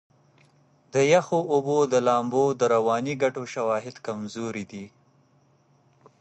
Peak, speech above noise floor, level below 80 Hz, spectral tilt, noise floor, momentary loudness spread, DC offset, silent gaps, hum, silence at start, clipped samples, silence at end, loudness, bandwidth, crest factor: -6 dBFS; 38 dB; -70 dBFS; -5.5 dB/octave; -62 dBFS; 13 LU; under 0.1%; none; none; 0.95 s; under 0.1%; 1.35 s; -24 LUFS; 8.6 kHz; 18 dB